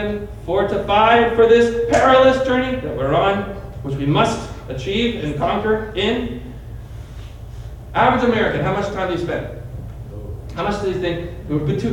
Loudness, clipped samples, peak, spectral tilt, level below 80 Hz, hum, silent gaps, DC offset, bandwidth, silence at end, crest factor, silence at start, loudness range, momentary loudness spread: -18 LUFS; under 0.1%; -2 dBFS; -6 dB/octave; -36 dBFS; none; none; under 0.1%; 12.5 kHz; 0 s; 16 dB; 0 s; 8 LU; 21 LU